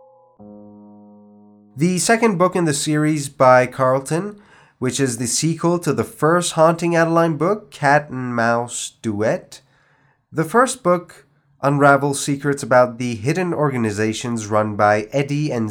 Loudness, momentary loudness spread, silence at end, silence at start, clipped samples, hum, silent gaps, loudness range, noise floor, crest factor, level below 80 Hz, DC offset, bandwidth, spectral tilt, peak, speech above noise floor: -18 LUFS; 9 LU; 0 s; 0.4 s; under 0.1%; none; none; 4 LU; -59 dBFS; 18 dB; -60 dBFS; under 0.1%; 19.5 kHz; -5 dB/octave; 0 dBFS; 41 dB